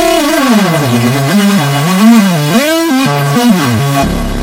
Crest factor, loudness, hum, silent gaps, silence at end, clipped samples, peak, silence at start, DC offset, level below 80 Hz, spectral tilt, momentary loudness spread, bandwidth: 8 dB; -9 LUFS; none; none; 0 s; 0.7%; 0 dBFS; 0 s; under 0.1%; -28 dBFS; -5 dB/octave; 5 LU; 16.5 kHz